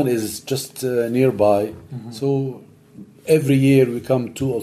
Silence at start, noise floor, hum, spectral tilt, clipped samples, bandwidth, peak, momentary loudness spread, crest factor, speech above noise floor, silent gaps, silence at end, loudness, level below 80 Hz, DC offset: 0 s; -43 dBFS; none; -6.5 dB/octave; under 0.1%; 15.5 kHz; -2 dBFS; 15 LU; 16 dB; 24 dB; none; 0 s; -19 LUFS; -56 dBFS; under 0.1%